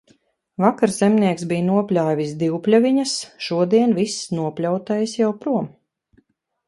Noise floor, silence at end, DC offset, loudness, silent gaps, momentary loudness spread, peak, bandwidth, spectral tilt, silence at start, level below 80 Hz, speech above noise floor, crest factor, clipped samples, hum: -62 dBFS; 1 s; under 0.1%; -20 LUFS; none; 8 LU; -2 dBFS; 11.5 kHz; -6 dB/octave; 0.6 s; -64 dBFS; 43 dB; 18 dB; under 0.1%; none